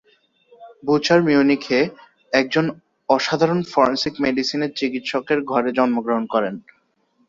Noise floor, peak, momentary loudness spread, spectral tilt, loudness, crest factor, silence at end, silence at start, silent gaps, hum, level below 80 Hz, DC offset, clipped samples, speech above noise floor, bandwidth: -64 dBFS; -2 dBFS; 9 LU; -5.5 dB/octave; -20 LUFS; 18 dB; 0.7 s; 0.6 s; none; none; -60 dBFS; under 0.1%; under 0.1%; 45 dB; 7.6 kHz